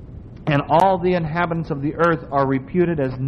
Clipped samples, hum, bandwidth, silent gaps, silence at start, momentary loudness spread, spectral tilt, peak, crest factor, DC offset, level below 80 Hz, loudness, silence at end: under 0.1%; none; 8.8 kHz; none; 0 s; 8 LU; -8.5 dB/octave; -4 dBFS; 16 dB; under 0.1%; -42 dBFS; -20 LUFS; 0 s